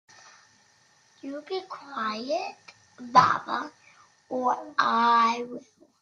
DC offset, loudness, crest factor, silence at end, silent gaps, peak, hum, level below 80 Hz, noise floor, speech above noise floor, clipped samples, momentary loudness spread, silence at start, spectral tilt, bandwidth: under 0.1%; -25 LUFS; 24 dB; 0.4 s; none; -4 dBFS; none; -74 dBFS; -62 dBFS; 36 dB; under 0.1%; 19 LU; 1.25 s; -4 dB/octave; 7.6 kHz